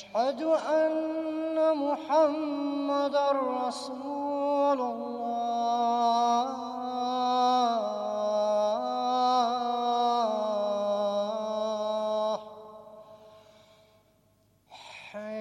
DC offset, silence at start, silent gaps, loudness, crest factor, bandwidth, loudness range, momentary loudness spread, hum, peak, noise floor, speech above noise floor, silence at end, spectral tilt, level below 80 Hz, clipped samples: under 0.1%; 0 s; none; -28 LUFS; 14 dB; 11 kHz; 7 LU; 9 LU; none; -14 dBFS; -66 dBFS; 38 dB; 0 s; -4.5 dB/octave; -78 dBFS; under 0.1%